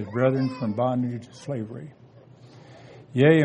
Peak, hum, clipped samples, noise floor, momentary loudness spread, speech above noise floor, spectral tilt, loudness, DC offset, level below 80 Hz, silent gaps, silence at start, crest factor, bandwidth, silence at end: -4 dBFS; none; under 0.1%; -50 dBFS; 23 LU; 26 dB; -8 dB/octave; -26 LUFS; under 0.1%; -66 dBFS; none; 0 s; 20 dB; 9.6 kHz; 0 s